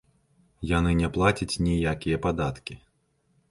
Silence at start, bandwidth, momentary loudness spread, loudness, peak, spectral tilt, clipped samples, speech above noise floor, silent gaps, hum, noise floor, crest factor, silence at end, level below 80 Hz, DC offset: 0.6 s; 11.5 kHz; 13 LU; -26 LUFS; -8 dBFS; -6 dB/octave; under 0.1%; 44 dB; none; none; -69 dBFS; 20 dB; 0.75 s; -38 dBFS; under 0.1%